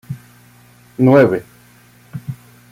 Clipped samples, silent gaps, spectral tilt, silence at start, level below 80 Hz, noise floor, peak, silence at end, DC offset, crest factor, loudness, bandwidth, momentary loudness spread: under 0.1%; none; -8.5 dB/octave; 0.1 s; -56 dBFS; -47 dBFS; -2 dBFS; 0.4 s; under 0.1%; 16 dB; -13 LUFS; 16 kHz; 24 LU